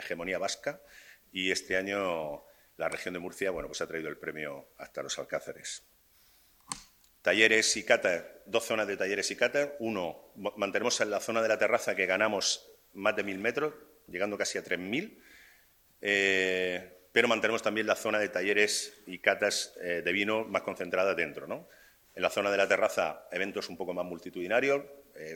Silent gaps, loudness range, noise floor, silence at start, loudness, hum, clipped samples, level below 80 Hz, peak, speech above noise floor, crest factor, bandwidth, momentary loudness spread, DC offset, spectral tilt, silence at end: none; 8 LU; -64 dBFS; 0 s; -30 LUFS; none; under 0.1%; -68 dBFS; -6 dBFS; 33 dB; 26 dB; 19.5 kHz; 14 LU; under 0.1%; -2.5 dB/octave; 0 s